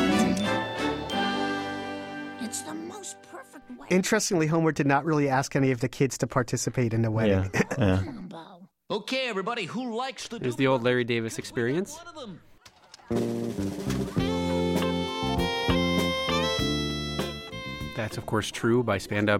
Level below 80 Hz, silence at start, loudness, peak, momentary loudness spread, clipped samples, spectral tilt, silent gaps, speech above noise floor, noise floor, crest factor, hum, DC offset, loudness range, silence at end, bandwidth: -48 dBFS; 0 s; -27 LUFS; -10 dBFS; 13 LU; under 0.1%; -5 dB/octave; none; 26 dB; -53 dBFS; 18 dB; none; under 0.1%; 5 LU; 0 s; 16.5 kHz